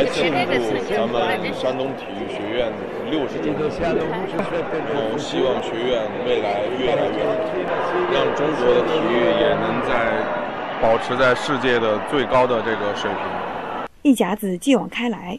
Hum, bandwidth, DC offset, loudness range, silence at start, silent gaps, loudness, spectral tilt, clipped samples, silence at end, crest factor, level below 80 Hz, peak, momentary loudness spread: none; 13 kHz; 0.3%; 4 LU; 0 s; none; -21 LUFS; -5.5 dB/octave; under 0.1%; 0 s; 16 dB; -48 dBFS; -4 dBFS; 7 LU